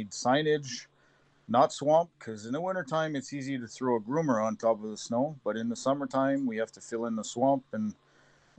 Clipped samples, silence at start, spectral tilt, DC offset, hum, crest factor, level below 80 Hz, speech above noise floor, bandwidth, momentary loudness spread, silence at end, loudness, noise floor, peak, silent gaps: under 0.1%; 0 s; -5 dB/octave; under 0.1%; none; 18 dB; -76 dBFS; 35 dB; 9.2 kHz; 10 LU; 0.65 s; -30 LUFS; -65 dBFS; -12 dBFS; none